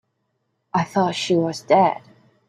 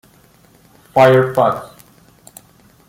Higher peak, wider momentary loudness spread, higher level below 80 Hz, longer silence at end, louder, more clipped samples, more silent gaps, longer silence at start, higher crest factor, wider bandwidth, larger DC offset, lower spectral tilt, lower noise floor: second, -4 dBFS vs 0 dBFS; about the same, 8 LU vs 10 LU; second, -64 dBFS vs -56 dBFS; second, 0.5 s vs 1.25 s; second, -20 LUFS vs -14 LUFS; neither; neither; second, 0.75 s vs 0.95 s; about the same, 18 dB vs 16 dB; second, 13 kHz vs 16.5 kHz; neither; about the same, -5.5 dB/octave vs -6.5 dB/octave; first, -72 dBFS vs -50 dBFS